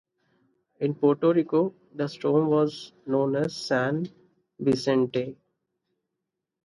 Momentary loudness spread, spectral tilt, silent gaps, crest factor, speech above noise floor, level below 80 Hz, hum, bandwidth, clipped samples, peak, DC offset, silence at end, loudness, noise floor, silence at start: 10 LU; -7 dB/octave; none; 18 dB; 59 dB; -68 dBFS; none; 11.5 kHz; under 0.1%; -8 dBFS; under 0.1%; 1.3 s; -26 LUFS; -84 dBFS; 0.8 s